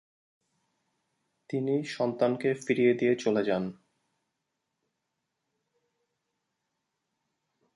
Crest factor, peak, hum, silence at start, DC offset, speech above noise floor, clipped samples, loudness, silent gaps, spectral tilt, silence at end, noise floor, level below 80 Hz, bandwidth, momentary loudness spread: 20 dB; -12 dBFS; none; 1.5 s; under 0.1%; 56 dB; under 0.1%; -28 LUFS; none; -6.5 dB/octave; 4 s; -83 dBFS; -76 dBFS; 11 kHz; 8 LU